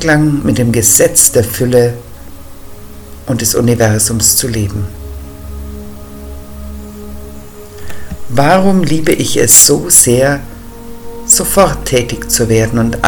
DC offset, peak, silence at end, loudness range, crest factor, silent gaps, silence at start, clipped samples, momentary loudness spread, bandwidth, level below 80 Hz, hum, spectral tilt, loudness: under 0.1%; 0 dBFS; 0 s; 15 LU; 12 dB; none; 0 s; 1%; 24 LU; over 20 kHz; -30 dBFS; none; -3.5 dB/octave; -9 LUFS